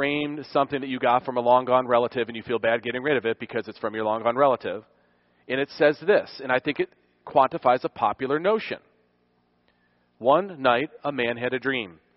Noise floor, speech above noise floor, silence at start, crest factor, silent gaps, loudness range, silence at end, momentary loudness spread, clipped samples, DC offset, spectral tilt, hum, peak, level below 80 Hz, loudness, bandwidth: -67 dBFS; 43 dB; 0 s; 20 dB; none; 3 LU; 0.25 s; 9 LU; under 0.1%; under 0.1%; -3 dB/octave; 60 Hz at -60 dBFS; -6 dBFS; -66 dBFS; -24 LUFS; 5.8 kHz